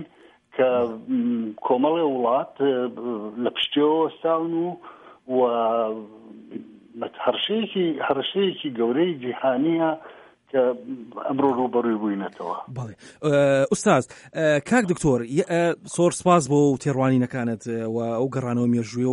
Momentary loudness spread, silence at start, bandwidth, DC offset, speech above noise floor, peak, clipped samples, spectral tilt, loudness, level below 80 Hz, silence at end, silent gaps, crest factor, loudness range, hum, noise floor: 12 LU; 0 s; 11.5 kHz; under 0.1%; 30 dB; -4 dBFS; under 0.1%; -5.5 dB/octave; -23 LUFS; -58 dBFS; 0 s; none; 18 dB; 5 LU; none; -53 dBFS